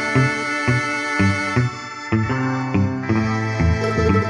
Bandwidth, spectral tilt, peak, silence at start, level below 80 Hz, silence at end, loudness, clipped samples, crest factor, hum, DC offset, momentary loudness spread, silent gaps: 10.5 kHz; -6.5 dB/octave; -4 dBFS; 0 s; -36 dBFS; 0 s; -20 LUFS; under 0.1%; 14 dB; none; under 0.1%; 4 LU; none